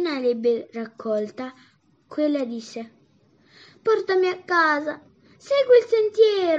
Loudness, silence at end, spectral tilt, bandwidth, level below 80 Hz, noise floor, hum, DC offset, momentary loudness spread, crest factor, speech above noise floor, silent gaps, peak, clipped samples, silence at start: -22 LUFS; 0 s; -4.5 dB/octave; 7.8 kHz; -82 dBFS; -59 dBFS; none; under 0.1%; 19 LU; 18 dB; 38 dB; none; -6 dBFS; under 0.1%; 0 s